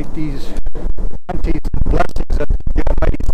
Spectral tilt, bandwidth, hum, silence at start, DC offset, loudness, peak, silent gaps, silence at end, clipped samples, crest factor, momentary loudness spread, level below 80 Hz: -7.5 dB/octave; 5.2 kHz; none; 0 s; under 0.1%; -22 LUFS; -4 dBFS; none; 0 s; under 0.1%; 4 dB; 9 LU; -16 dBFS